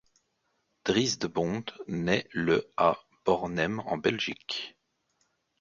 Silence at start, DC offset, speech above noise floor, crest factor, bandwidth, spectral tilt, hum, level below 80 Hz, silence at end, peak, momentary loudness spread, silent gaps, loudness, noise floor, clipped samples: 0.85 s; under 0.1%; 47 dB; 22 dB; 7.6 kHz; -4.5 dB/octave; none; -60 dBFS; 0.9 s; -10 dBFS; 9 LU; none; -29 LUFS; -76 dBFS; under 0.1%